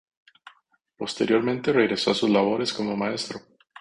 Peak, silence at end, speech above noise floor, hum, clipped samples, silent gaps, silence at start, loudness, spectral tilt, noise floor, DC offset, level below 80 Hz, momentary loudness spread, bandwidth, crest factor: -6 dBFS; 0.4 s; 39 dB; none; under 0.1%; none; 0.45 s; -24 LUFS; -5 dB/octave; -62 dBFS; under 0.1%; -64 dBFS; 12 LU; 11 kHz; 18 dB